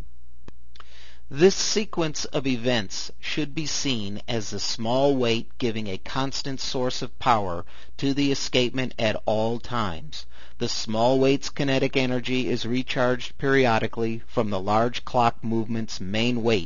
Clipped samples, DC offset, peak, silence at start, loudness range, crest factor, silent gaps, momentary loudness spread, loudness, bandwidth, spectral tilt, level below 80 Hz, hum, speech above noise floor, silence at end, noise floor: under 0.1%; 4%; -4 dBFS; 0 s; 3 LU; 20 dB; none; 9 LU; -25 LUFS; 7.4 kHz; -4.5 dB/octave; -50 dBFS; none; 25 dB; 0 s; -50 dBFS